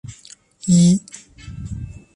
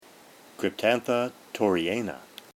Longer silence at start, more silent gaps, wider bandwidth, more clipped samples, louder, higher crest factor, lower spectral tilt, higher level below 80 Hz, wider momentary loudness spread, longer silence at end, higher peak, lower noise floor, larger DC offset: second, 0.1 s vs 0.6 s; neither; second, 11 kHz vs 17.5 kHz; neither; first, -16 LUFS vs -27 LUFS; about the same, 16 dB vs 20 dB; about the same, -6 dB/octave vs -5 dB/octave; first, -42 dBFS vs -68 dBFS; first, 24 LU vs 9 LU; about the same, 0.25 s vs 0.3 s; first, -4 dBFS vs -8 dBFS; second, -46 dBFS vs -52 dBFS; neither